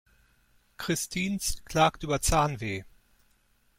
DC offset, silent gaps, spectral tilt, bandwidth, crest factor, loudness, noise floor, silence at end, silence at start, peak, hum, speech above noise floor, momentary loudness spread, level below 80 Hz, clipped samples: under 0.1%; none; -4 dB/octave; 16.5 kHz; 20 dB; -28 LUFS; -67 dBFS; 0.9 s; 0.8 s; -10 dBFS; none; 39 dB; 10 LU; -42 dBFS; under 0.1%